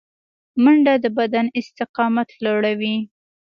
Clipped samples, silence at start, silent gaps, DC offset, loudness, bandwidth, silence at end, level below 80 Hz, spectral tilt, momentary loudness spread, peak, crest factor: under 0.1%; 0.55 s; 1.89-1.94 s; under 0.1%; -19 LUFS; 6.8 kHz; 0.45 s; -68 dBFS; -7 dB/octave; 12 LU; -4 dBFS; 14 dB